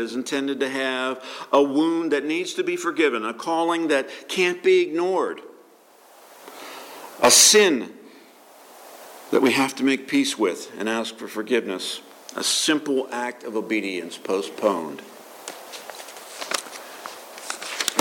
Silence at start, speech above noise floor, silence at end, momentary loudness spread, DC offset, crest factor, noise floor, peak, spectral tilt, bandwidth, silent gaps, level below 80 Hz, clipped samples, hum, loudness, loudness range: 0 s; 30 dB; 0 s; 19 LU; under 0.1%; 20 dB; -52 dBFS; -4 dBFS; -1.5 dB/octave; 17.5 kHz; none; -72 dBFS; under 0.1%; none; -22 LUFS; 10 LU